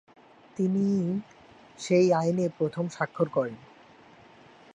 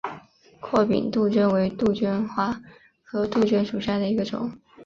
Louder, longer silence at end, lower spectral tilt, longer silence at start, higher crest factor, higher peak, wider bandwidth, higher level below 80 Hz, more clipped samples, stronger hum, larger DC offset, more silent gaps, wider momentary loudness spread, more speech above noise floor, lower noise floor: second, -27 LUFS vs -24 LUFS; first, 1.15 s vs 0 s; about the same, -7 dB/octave vs -7.5 dB/octave; first, 0.6 s vs 0.05 s; about the same, 18 dB vs 18 dB; second, -12 dBFS vs -6 dBFS; first, 9.8 kHz vs 7.4 kHz; second, -70 dBFS vs -56 dBFS; neither; neither; neither; neither; about the same, 13 LU vs 13 LU; about the same, 28 dB vs 25 dB; first, -54 dBFS vs -48 dBFS